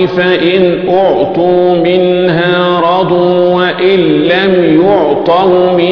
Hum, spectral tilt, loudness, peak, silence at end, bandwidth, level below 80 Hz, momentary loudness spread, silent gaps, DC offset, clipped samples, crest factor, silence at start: none; -8.5 dB/octave; -9 LUFS; 0 dBFS; 0 s; 5.4 kHz; -44 dBFS; 2 LU; none; under 0.1%; 0.2%; 8 dB; 0 s